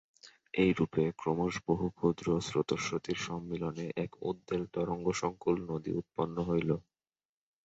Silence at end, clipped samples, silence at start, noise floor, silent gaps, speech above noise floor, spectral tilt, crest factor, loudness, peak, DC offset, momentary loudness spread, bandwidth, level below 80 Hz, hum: 0.85 s; under 0.1%; 0.25 s; under -90 dBFS; none; over 57 dB; -6 dB/octave; 20 dB; -34 LUFS; -14 dBFS; under 0.1%; 7 LU; 8.2 kHz; -58 dBFS; none